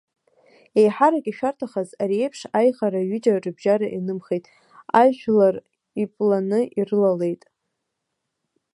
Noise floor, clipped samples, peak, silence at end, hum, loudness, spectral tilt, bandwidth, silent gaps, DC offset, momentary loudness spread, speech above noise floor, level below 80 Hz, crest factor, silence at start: -79 dBFS; under 0.1%; -2 dBFS; 1.4 s; none; -21 LUFS; -7 dB/octave; 11.5 kHz; none; under 0.1%; 11 LU; 58 dB; -72 dBFS; 20 dB; 0.75 s